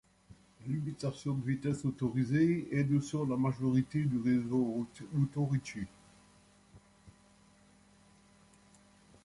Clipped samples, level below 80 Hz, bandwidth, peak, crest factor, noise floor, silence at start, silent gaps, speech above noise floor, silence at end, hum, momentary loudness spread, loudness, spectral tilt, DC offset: under 0.1%; -66 dBFS; 11.5 kHz; -18 dBFS; 16 dB; -63 dBFS; 0.3 s; none; 31 dB; 2.15 s; 50 Hz at -65 dBFS; 9 LU; -33 LUFS; -8 dB/octave; under 0.1%